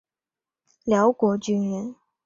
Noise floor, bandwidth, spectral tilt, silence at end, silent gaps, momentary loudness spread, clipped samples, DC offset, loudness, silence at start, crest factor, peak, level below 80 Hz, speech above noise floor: under -90 dBFS; 7.6 kHz; -6.5 dB/octave; 0.35 s; none; 14 LU; under 0.1%; under 0.1%; -23 LUFS; 0.85 s; 16 dB; -8 dBFS; -64 dBFS; over 68 dB